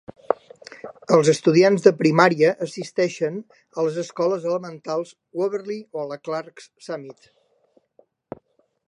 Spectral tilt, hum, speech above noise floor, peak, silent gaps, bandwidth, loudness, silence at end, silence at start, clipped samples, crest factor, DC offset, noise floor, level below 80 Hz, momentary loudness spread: -5.5 dB/octave; none; 42 dB; -2 dBFS; none; 11 kHz; -21 LUFS; 1.75 s; 0.3 s; under 0.1%; 22 dB; under 0.1%; -63 dBFS; -72 dBFS; 23 LU